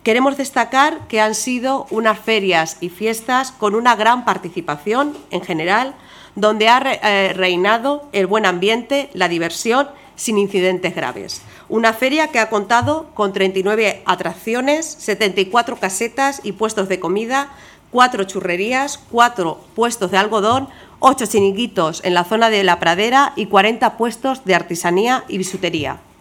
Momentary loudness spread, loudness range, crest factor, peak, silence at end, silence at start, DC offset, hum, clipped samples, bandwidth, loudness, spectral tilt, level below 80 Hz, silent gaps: 8 LU; 3 LU; 16 dB; 0 dBFS; 0.2 s; 0.05 s; under 0.1%; none; under 0.1%; 18.5 kHz; -17 LUFS; -3.5 dB/octave; -56 dBFS; none